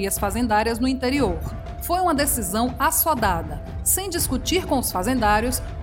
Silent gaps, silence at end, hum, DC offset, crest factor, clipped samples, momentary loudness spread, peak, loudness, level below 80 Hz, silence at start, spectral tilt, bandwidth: none; 0 s; none; under 0.1%; 16 dB; under 0.1%; 6 LU; -6 dBFS; -22 LUFS; -34 dBFS; 0 s; -3.5 dB/octave; 17 kHz